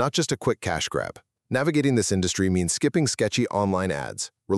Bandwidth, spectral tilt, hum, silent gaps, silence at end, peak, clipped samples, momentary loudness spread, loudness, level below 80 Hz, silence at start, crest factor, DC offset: 13.5 kHz; -4.5 dB/octave; none; none; 0 s; -8 dBFS; under 0.1%; 7 LU; -24 LUFS; -52 dBFS; 0 s; 16 dB; under 0.1%